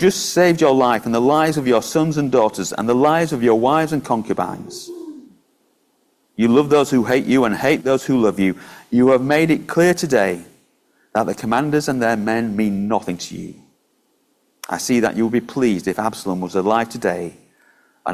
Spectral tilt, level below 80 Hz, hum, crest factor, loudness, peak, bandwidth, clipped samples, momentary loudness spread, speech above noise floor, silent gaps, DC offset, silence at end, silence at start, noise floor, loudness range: -5.5 dB/octave; -54 dBFS; none; 16 dB; -18 LUFS; -2 dBFS; 16 kHz; under 0.1%; 13 LU; 46 dB; none; under 0.1%; 0 s; 0 s; -63 dBFS; 6 LU